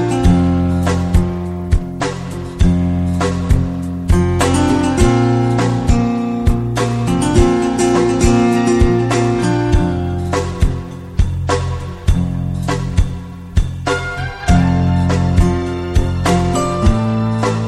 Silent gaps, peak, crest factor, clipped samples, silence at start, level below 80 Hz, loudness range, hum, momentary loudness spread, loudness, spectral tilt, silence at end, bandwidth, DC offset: none; 0 dBFS; 14 dB; under 0.1%; 0 s; -22 dBFS; 5 LU; none; 7 LU; -16 LUFS; -6.5 dB/octave; 0 s; 13 kHz; under 0.1%